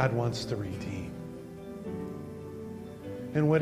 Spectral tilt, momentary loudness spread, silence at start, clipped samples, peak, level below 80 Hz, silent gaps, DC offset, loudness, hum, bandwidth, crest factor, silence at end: -7 dB/octave; 13 LU; 0 s; under 0.1%; -12 dBFS; -58 dBFS; none; under 0.1%; -35 LUFS; none; 15 kHz; 20 dB; 0 s